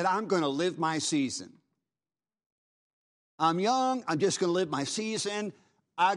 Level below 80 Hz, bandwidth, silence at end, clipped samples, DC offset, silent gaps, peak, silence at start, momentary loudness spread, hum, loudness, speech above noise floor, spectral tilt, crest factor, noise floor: -80 dBFS; 11.5 kHz; 0 s; under 0.1%; under 0.1%; 2.46-3.38 s; -12 dBFS; 0 s; 7 LU; none; -29 LUFS; over 61 dB; -4 dB/octave; 18 dB; under -90 dBFS